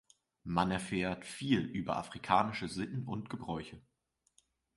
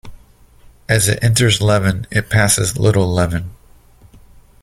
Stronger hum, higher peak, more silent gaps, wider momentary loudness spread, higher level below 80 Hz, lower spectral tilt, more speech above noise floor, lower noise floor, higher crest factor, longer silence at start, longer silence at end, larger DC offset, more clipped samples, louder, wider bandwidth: neither; second, -14 dBFS vs 0 dBFS; neither; first, 11 LU vs 8 LU; second, -60 dBFS vs -38 dBFS; first, -5.5 dB/octave vs -4 dB/octave; first, 38 dB vs 31 dB; first, -73 dBFS vs -46 dBFS; first, 24 dB vs 16 dB; first, 0.45 s vs 0.05 s; second, 0.95 s vs 1.1 s; neither; neither; second, -36 LUFS vs -15 LUFS; second, 11.5 kHz vs 15.5 kHz